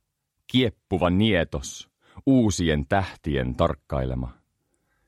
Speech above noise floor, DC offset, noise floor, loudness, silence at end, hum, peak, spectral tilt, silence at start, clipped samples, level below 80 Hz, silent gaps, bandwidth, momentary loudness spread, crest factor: 49 dB; under 0.1%; -73 dBFS; -24 LUFS; 0.75 s; none; -6 dBFS; -5.5 dB/octave; 0.5 s; under 0.1%; -40 dBFS; none; 13 kHz; 13 LU; 18 dB